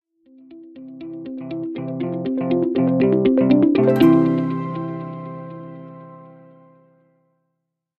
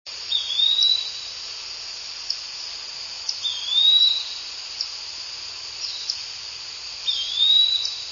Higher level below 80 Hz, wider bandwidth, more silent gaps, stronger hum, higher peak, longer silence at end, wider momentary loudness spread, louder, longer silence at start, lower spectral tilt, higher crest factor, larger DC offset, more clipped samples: first, -58 dBFS vs -64 dBFS; first, 13 kHz vs 7.4 kHz; neither; neither; first, -2 dBFS vs -6 dBFS; first, 1.7 s vs 0 s; first, 22 LU vs 16 LU; about the same, -19 LUFS vs -21 LUFS; first, 0.5 s vs 0.05 s; first, -9.5 dB/octave vs 2.5 dB/octave; about the same, 18 dB vs 20 dB; neither; neither